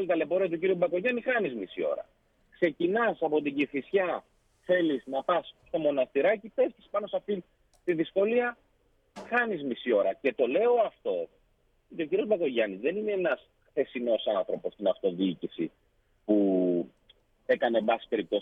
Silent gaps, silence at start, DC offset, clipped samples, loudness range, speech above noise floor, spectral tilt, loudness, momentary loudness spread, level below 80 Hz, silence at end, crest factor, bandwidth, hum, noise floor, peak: none; 0 s; under 0.1%; under 0.1%; 2 LU; 40 dB; -7.5 dB/octave; -29 LUFS; 9 LU; -70 dBFS; 0 s; 16 dB; 5.8 kHz; none; -68 dBFS; -12 dBFS